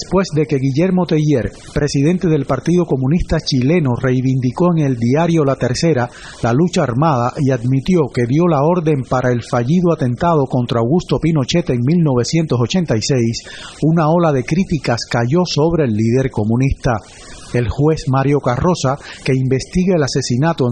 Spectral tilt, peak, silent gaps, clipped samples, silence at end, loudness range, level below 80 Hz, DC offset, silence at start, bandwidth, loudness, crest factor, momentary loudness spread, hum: -6.5 dB/octave; -4 dBFS; none; under 0.1%; 0 s; 1 LU; -34 dBFS; under 0.1%; 0 s; 9.6 kHz; -16 LUFS; 12 dB; 4 LU; none